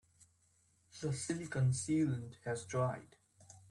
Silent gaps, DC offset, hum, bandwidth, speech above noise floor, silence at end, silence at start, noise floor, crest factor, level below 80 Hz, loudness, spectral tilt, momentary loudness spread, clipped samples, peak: none; under 0.1%; none; 11.5 kHz; 37 dB; 0.1 s; 0.95 s; -73 dBFS; 14 dB; -70 dBFS; -38 LUFS; -6 dB/octave; 10 LU; under 0.1%; -24 dBFS